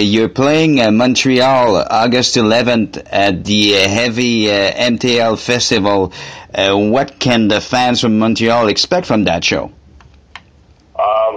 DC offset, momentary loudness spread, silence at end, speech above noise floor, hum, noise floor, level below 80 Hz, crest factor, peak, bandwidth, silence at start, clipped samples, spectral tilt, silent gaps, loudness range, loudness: 0.3%; 5 LU; 0 s; 34 dB; none; -47 dBFS; -44 dBFS; 14 dB; 0 dBFS; 10.5 kHz; 0 s; under 0.1%; -4 dB/octave; none; 3 LU; -12 LUFS